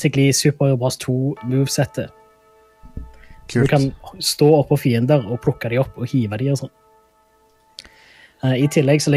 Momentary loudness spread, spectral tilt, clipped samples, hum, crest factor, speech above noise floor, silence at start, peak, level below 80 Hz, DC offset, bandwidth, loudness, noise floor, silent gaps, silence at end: 19 LU; -5.5 dB/octave; under 0.1%; none; 16 dB; 39 dB; 0 s; -2 dBFS; -46 dBFS; under 0.1%; 15.5 kHz; -19 LUFS; -57 dBFS; none; 0 s